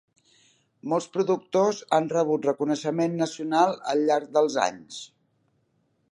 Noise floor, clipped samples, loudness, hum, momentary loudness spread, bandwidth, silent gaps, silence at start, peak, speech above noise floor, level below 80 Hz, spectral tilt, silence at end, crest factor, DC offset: -70 dBFS; under 0.1%; -25 LUFS; none; 11 LU; 11.5 kHz; none; 0.85 s; -6 dBFS; 46 dB; -78 dBFS; -5 dB/octave; 1.05 s; 20 dB; under 0.1%